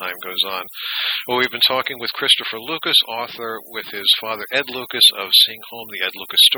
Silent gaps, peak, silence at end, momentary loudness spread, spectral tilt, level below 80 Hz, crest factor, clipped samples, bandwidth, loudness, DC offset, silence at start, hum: none; -2 dBFS; 0 s; 14 LU; -0.5 dB/octave; -68 dBFS; 18 dB; under 0.1%; over 20 kHz; -17 LUFS; under 0.1%; 0 s; none